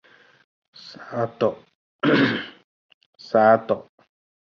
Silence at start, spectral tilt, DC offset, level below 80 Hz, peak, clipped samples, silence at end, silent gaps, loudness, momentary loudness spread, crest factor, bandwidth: 0.85 s; -7 dB/octave; under 0.1%; -66 dBFS; -4 dBFS; under 0.1%; 0.8 s; 1.75-1.99 s, 2.64-3.13 s; -21 LUFS; 24 LU; 20 dB; 7 kHz